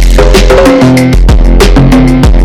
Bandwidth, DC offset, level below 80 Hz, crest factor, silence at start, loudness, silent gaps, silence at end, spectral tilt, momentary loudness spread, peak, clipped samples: 14.5 kHz; under 0.1%; -6 dBFS; 2 dB; 0 s; -5 LUFS; none; 0 s; -6 dB/octave; 2 LU; 0 dBFS; 1%